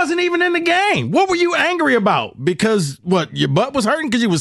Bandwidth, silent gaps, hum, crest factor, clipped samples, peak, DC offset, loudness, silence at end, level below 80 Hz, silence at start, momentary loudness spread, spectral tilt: 12.5 kHz; none; none; 14 dB; under 0.1%; -2 dBFS; under 0.1%; -16 LUFS; 0 s; -54 dBFS; 0 s; 4 LU; -5 dB/octave